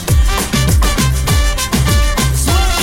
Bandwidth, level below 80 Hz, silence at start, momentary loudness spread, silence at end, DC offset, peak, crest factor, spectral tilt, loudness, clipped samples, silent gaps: 16.5 kHz; -14 dBFS; 0 s; 2 LU; 0 s; under 0.1%; 0 dBFS; 12 dB; -4 dB/octave; -13 LUFS; under 0.1%; none